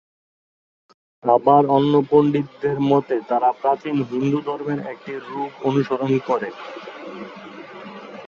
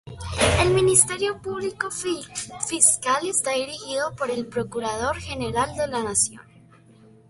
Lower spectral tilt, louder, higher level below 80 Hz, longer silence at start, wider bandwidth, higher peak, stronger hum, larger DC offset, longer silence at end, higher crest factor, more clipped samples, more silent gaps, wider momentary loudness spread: first, -8.5 dB/octave vs -3 dB/octave; about the same, -20 LUFS vs -22 LUFS; second, -64 dBFS vs -42 dBFS; first, 1.25 s vs 0.05 s; second, 7 kHz vs 12 kHz; about the same, -2 dBFS vs 0 dBFS; neither; neither; second, 0 s vs 0.9 s; about the same, 20 dB vs 24 dB; neither; neither; first, 20 LU vs 12 LU